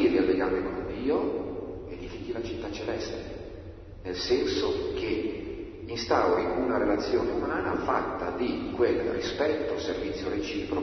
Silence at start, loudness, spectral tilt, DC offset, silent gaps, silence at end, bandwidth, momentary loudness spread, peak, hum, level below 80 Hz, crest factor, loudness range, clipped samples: 0 s; -29 LUFS; -5.5 dB/octave; under 0.1%; none; 0 s; 6.4 kHz; 13 LU; -10 dBFS; none; -48 dBFS; 20 dB; 6 LU; under 0.1%